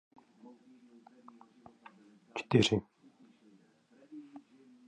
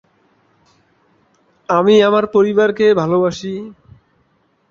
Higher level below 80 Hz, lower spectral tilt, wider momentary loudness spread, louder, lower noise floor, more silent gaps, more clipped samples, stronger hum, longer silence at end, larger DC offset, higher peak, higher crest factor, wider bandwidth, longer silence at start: second, -66 dBFS vs -58 dBFS; about the same, -5.5 dB/octave vs -6 dB/octave; first, 30 LU vs 17 LU; second, -31 LUFS vs -14 LUFS; first, -65 dBFS vs -60 dBFS; neither; neither; neither; second, 0.5 s vs 1 s; neither; second, -12 dBFS vs 0 dBFS; first, 28 dB vs 16 dB; first, 10 kHz vs 7.2 kHz; first, 2.35 s vs 1.7 s